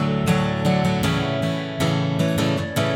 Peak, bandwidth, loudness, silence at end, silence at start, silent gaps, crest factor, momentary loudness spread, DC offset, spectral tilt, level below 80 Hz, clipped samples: -8 dBFS; 17.5 kHz; -21 LUFS; 0 s; 0 s; none; 14 dB; 3 LU; under 0.1%; -6 dB/octave; -42 dBFS; under 0.1%